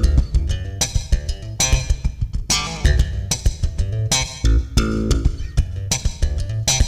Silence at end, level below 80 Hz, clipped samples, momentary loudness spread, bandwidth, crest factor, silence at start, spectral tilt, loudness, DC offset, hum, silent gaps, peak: 0 s; -20 dBFS; under 0.1%; 6 LU; 16 kHz; 14 dB; 0 s; -3.5 dB/octave; -21 LUFS; under 0.1%; none; none; -4 dBFS